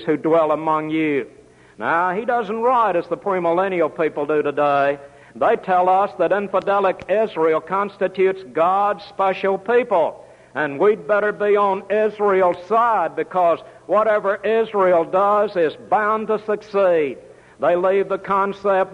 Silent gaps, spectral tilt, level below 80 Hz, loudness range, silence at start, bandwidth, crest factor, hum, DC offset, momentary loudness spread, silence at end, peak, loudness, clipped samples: none; -7 dB/octave; -62 dBFS; 2 LU; 0 s; 10 kHz; 14 dB; none; under 0.1%; 6 LU; 0 s; -6 dBFS; -19 LUFS; under 0.1%